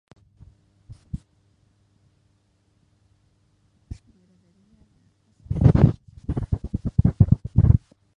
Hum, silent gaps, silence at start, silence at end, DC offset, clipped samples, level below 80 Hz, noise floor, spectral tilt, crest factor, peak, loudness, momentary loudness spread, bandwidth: none; none; 0.9 s; 0.4 s; under 0.1%; under 0.1%; -32 dBFS; -65 dBFS; -11 dB/octave; 22 dB; -2 dBFS; -21 LUFS; 24 LU; 5.2 kHz